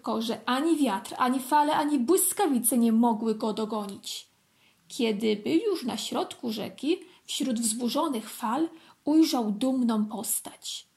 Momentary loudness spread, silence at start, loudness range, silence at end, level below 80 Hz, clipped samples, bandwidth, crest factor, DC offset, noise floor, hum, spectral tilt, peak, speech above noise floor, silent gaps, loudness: 11 LU; 0.05 s; 6 LU; 0.15 s; -78 dBFS; under 0.1%; 16 kHz; 16 dB; under 0.1%; -65 dBFS; none; -3.5 dB/octave; -10 dBFS; 38 dB; none; -27 LUFS